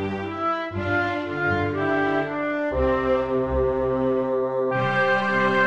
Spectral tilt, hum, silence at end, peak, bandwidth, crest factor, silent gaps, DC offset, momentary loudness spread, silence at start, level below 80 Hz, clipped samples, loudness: -7.5 dB/octave; none; 0 s; -8 dBFS; 8.2 kHz; 14 dB; none; under 0.1%; 5 LU; 0 s; -40 dBFS; under 0.1%; -23 LUFS